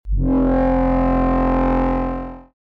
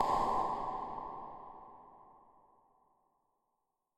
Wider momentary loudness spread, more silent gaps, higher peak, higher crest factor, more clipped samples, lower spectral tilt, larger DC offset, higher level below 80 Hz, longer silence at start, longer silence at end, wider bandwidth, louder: second, 8 LU vs 24 LU; neither; first, -12 dBFS vs -18 dBFS; second, 6 dB vs 22 dB; neither; first, -10.5 dB/octave vs -5.5 dB/octave; neither; first, -24 dBFS vs -60 dBFS; about the same, 0.05 s vs 0 s; second, 0.35 s vs 1.85 s; second, 4.7 kHz vs 14 kHz; first, -18 LUFS vs -37 LUFS